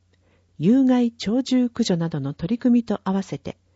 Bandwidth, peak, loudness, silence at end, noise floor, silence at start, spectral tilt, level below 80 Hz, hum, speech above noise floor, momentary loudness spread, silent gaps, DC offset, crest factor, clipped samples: 8 kHz; -8 dBFS; -22 LUFS; 0.25 s; -61 dBFS; 0.6 s; -6.5 dB/octave; -56 dBFS; none; 40 dB; 9 LU; none; under 0.1%; 14 dB; under 0.1%